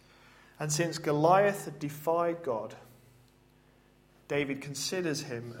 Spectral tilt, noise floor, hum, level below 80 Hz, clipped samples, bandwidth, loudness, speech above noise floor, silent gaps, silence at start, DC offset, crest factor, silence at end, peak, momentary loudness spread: -4.5 dB/octave; -63 dBFS; none; -70 dBFS; under 0.1%; 16.5 kHz; -31 LUFS; 32 dB; none; 0.6 s; under 0.1%; 22 dB; 0 s; -10 dBFS; 14 LU